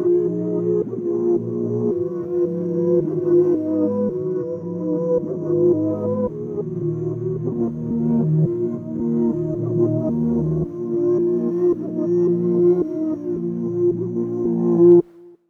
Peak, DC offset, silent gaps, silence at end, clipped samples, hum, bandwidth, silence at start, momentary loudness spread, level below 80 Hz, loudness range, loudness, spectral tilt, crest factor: -4 dBFS; under 0.1%; none; 0.2 s; under 0.1%; none; 2 kHz; 0 s; 7 LU; -52 dBFS; 3 LU; -20 LUFS; -12.5 dB/octave; 16 dB